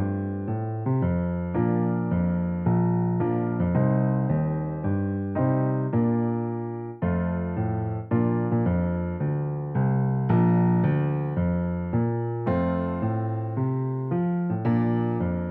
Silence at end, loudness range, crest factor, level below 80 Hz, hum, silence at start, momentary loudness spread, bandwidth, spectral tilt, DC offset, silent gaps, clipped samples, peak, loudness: 0 s; 2 LU; 14 dB; -48 dBFS; none; 0 s; 5 LU; 3.3 kHz; -13 dB/octave; under 0.1%; none; under 0.1%; -12 dBFS; -25 LUFS